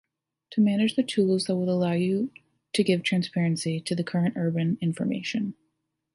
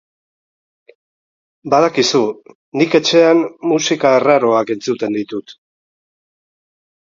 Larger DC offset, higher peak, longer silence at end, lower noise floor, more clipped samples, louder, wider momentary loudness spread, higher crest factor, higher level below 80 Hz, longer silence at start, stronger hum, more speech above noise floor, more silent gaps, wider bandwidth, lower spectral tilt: neither; second, -10 dBFS vs 0 dBFS; second, 0.6 s vs 1.5 s; second, -77 dBFS vs under -90 dBFS; neither; second, -26 LUFS vs -14 LUFS; second, 6 LU vs 15 LU; about the same, 16 dB vs 16 dB; second, -70 dBFS vs -62 dBFS; second, 0.5 s vs 1.65 s; neither; second, 52 dB vs over 76 dB; second, none vs 2.55-2.72 s; first, 11.5 kHz vs 7.6 kHz; first, -6 dB/octave vs -4 dB/octave